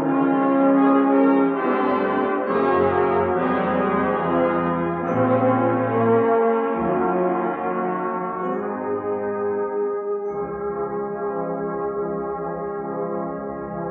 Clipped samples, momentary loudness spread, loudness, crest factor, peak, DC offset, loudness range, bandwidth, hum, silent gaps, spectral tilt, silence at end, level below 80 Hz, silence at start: under 0.1%; 10 LU; -22 LUFS; 16 dB; -6 dBFS; under 0.1%; 7 LU; 4.3 kHz; 60 Hz at -50 dBFS; none; -7 dB/octave; 0 s; -56 dBFS; 0 s